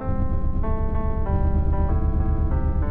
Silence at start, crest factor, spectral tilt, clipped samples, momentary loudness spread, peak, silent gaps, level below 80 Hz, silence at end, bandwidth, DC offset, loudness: 0 s; 10 dB; -12.5 dB/octave; under 0.1%; 3 LU; -10 dBFS; none; -22 dBFS; 0 s; 2.7 kHz; under 0.1%; -25 LUFS